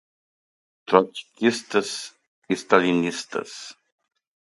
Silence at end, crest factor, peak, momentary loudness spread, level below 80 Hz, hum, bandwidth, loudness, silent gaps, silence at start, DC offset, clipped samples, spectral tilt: 0.75 s; 24 dB; 0 dBFS; 19 LU; -70 dBFS; none; 11.5 kHz; -23 LUFS; 2.28-2.42 s; 0.9 s; under 0.1%; under 0.1%; -4.5 dB/octave